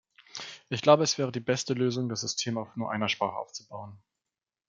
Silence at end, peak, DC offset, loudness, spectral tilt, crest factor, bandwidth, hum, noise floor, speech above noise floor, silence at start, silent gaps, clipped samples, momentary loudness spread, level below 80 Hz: 0.7 s; -4 dBFS; under 0.1%; -28 LUFS; -4 dB/octave; 24 dB; 9.2 kHz; none; -90 dBFS; 61 dB; 0.35 s; none; under 0.1%; 19 LU; -74 dBFS